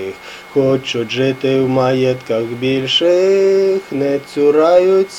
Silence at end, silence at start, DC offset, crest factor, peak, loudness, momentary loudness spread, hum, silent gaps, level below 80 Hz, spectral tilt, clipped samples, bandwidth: 0 s; 0 s; under 0.1%; 14 dB; 0 dBFS; -14 LUFS; 8 LU; none; none; -56 dBFS; -5.5 dB/octave; under 0.1%; 11.5 kHz